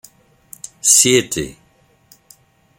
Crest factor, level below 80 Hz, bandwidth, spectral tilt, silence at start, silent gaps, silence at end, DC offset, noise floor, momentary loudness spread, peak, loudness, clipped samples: 20 dB; -52 dBFS; 17 kHz; -1.5 dB/octave; 0.85 s; none; 1.25 s; under 0.1%; -56 dBFS; 25 LU; 0 dBFS; -13 LUFS; under 0.1%